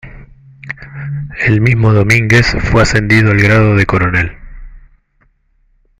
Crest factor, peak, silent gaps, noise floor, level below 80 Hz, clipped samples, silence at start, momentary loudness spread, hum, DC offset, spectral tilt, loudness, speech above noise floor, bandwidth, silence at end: 12 dB; 0 dBFS; none; -55 dBFS; -28 dBFS; under 0.1%; 0.05 s; 15 LU; none; under 0.1%; -6 dB/octave; -10 LUFS; 46 dB; 11.5 kHz; 1.2 s